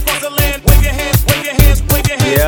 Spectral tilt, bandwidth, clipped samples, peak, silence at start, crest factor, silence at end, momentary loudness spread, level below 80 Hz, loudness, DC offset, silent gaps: -4.5 dB/octave; over 20 kHz; 0.4%; 0 dBFS; 0 s; 12 dB; 0 s; 3 LU; -14 dBFS; -12 LUFS; under 0.1%; none